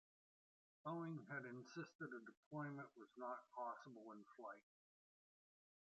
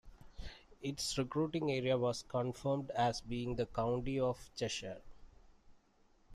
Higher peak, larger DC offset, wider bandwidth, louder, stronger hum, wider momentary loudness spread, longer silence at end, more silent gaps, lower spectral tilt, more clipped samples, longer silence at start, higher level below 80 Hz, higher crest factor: second, -36 dBFS vs -22 dBFS; neither; second, 8 kHz vs 14 kHz; second, -54 LUFS vs -38 LUFS; neither; second, 9 LU vs 15 LU; first, 1.2 s vs 0 s; first, 1.95-1.99 s, 2.37-2.51 s vs none; about the same, -6 dB/octave vs -5 dB/octave; neither; first, 0.85 s vs 0.05 s; second, under -90 dBFS vs -56 dBFS; about the same, 20 dB vs 18 dB